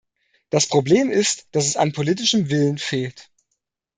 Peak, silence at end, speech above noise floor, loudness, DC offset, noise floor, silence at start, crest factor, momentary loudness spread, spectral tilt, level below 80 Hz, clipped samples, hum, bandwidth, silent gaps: -4 dBFS; 0.75 s; 57 dB; -20 LUFS; under 0.1%; -76 dBFS; 0.55 s; 18 dB; 8 LU; -4 dB/octave; -62 dBFS; under 0.1%; none; 9.6 kHz; none